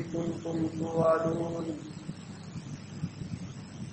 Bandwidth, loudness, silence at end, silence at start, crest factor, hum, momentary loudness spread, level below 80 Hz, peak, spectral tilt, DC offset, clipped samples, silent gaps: 8.4 kHz; -33 LUFS; 0 s; 0 s; 20 dB; none; 16 LU; -60 dBFS; -14 dBFS; -7 dB/octave; under 0.1%; under 0.1%; none